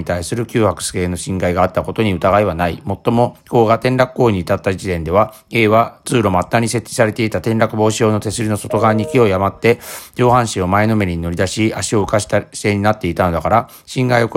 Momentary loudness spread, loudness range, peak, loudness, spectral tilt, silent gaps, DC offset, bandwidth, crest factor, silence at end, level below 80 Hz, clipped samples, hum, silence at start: 6 LU; 1 LU; 0 dBFS; -16 LUFS; -5.5 dB/octave; none; under 0.1%; 16.5 kHz; 16 dB; 0 s; -44 dBFS; under 0.1%; none; 0 s